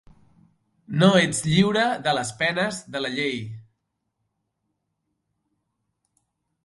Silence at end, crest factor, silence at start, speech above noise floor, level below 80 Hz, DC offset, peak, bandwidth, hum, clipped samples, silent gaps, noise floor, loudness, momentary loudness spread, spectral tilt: 3.05 s; 22 dB; 0.9 s; 55 dB; -58 dBFS; under 0.1%; -4 dBFS; 11.5 kHz; none; under 0.1%; none; -77 dBFS; -22 LUFS; 12 LU; -4.5 dB/octave